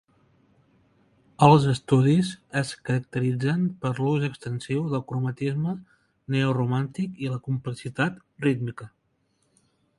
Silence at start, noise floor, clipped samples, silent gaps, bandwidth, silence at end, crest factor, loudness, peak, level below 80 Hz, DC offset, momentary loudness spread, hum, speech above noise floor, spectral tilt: 1.4 s; -71 dBFS; under 0.1%; none; 11.5 kHz; 1.1 s; 24 dB; -25 LUFS; 0 dBFS; -60 dBFS; under 0.1%; 11 LU; none; 46 dB; -7 dB/octave